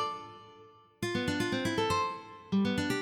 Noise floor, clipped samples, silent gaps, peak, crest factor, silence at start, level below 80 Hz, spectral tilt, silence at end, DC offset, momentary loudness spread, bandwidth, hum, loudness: -57 dBFS; under 0.1%; none; -18 dBFS; 14 dB; 0 s; -60 dBFS; -5 dB/octave; 0 s; under 0.1%; 14 LU; 18 kHz; none; -32 LUFS